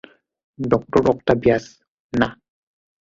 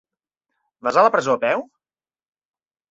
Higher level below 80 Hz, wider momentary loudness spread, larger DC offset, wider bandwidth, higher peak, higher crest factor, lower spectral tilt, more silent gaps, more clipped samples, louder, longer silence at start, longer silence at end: first, -46 dBFS vs -68 dBFS; second, 7 LU vs 10 LU; neither; about the same, 7.6 kHz vs 8 kHz; about the same, -2 dBFS vs -2 dBFS; about the same, 20 dB vs 22 dB; first, -7 dB/octave vs -4.5 dB/octave; first, 1.88-2.10 s vs none; neither; about the same, -20 LUFS vs -19 LUFS; second, 0.6 s vs 0.85 s; second, 0.75 s vs 1.25 s